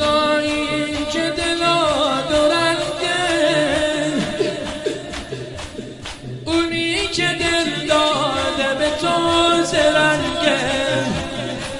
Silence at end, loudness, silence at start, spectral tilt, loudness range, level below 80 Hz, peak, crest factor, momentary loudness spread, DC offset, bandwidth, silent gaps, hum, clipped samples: 0 s; -18 LUFS; 0 s; -3.5 dB/octave; 5 LU; -42 dBFS; -2 dBFS; 18 dB; 13 LU; under 0.1%; 11.5 kHz; none; none; under 0.1%